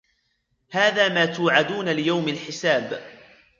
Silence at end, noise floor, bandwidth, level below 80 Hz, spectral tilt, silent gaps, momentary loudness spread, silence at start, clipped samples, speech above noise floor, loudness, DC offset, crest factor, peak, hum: 0.45 s; -71 dBFS; 7.6 kHz; -70 dBFS; -4.5 dB/octave; none; 10 LU; 0.7 s; under 0.1%; 49 dB; -21 LUFS; under 0.1%; 20 dB; -2 dBFS; none